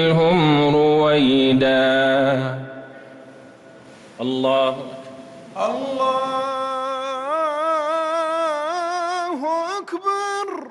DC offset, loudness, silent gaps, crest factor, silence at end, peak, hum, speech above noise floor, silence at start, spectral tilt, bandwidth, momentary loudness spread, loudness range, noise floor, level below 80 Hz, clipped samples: under 0.1%; -20 LUFS; none; 12 dB; 0 s; -8 dBFS; none; 26 dB; 0 s; -6 dB/octave; 11.5 kHz; 15 LU; 7 LU; -44 dBFS; -58 dBFS; under 0.1%